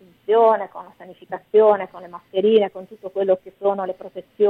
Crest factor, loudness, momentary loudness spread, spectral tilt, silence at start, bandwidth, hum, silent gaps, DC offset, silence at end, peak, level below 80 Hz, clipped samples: 16 dB; -19 LUFS; 19 LU; -8 dB/octave; 0.3 s; 4 kHz; none; none; under 0.1%; 0 s; -4 dBFS; -70 dBFS; under 0.1%